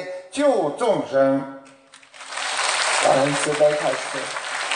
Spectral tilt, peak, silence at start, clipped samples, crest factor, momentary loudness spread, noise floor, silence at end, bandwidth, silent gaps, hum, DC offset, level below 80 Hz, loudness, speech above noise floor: -3 dB/octave; -4 dBFS; 0 s; under 0.1%; 18 dB; 10 LU; -48 dBFS; 0 s; 10 kHz; none; none; under 0.1%; -70 dBFS; -21 LUFS; 29 dB